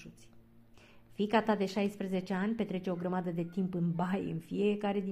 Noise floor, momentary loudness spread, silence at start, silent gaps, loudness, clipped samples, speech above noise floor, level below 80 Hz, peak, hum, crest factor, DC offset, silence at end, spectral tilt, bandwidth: -59 dBFS; 6 LU; 0 s; none; -34 LUFS; under 0.1%; 26 dB; -68 dBFS; -16 dBFS; none; 18 dB; under 0.1%; 0 s; -7.5 dB/octave; 13 kHz